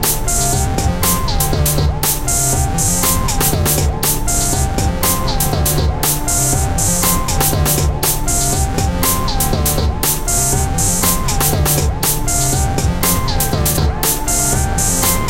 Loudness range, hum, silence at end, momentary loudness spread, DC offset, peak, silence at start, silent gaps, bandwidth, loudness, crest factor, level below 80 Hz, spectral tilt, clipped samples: 1 LU; none; 0 s; 3 LU; under 0.1%; 0 dBFS; 0 s; none; 17 kHz; -15 LUFS; 14 dB; -20 dBFS; -3.5 dB/octave; under 0.1%